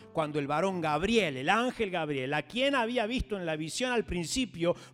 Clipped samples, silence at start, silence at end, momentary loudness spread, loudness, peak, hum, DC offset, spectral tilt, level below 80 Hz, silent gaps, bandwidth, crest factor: under 0.1%; 0 s; 0.05 s; 5 LU; -30 LUFS; -12 dBFS; none; under 0.1%; -4.5 dB/octave; -50 dBFS; none; 16 kHz; 18 dB